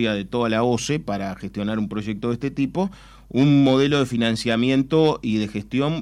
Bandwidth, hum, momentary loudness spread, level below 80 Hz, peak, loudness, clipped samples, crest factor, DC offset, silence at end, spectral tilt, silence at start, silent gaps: 12 kHz; none; 10 LU; -48 dBFS; -8 dBFS; -21 LUFS; under 0.1%; 14 dB; under 0.1%; 0 s; -6 dB/octave; 0 s; none